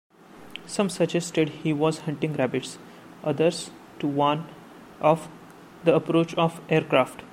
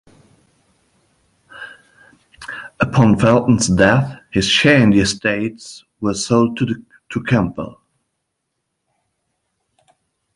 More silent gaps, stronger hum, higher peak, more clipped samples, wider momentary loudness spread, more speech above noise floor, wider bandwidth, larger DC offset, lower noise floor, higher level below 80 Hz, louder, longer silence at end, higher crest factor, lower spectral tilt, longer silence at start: neither; neither; second, -6 dBFS vs 0 dBFS; neither; second, 15 LU vs 23 LU; second, 22 dB vs 60 dB; first, 15.5 kHz vs 11.5 kHz; neither; second, -46 dBFS vs -75 dBFS; second, -66 dBFS vs -44 dBFS; second, -25 LUFS vs -16 LUFS; second, 0.05 s vs 2.65 s; about the same, 20 dB vs 18 dB; about the same, -5.5 dB/octave vs -5 dB/octave; second, 0.35 s vs 1.55 s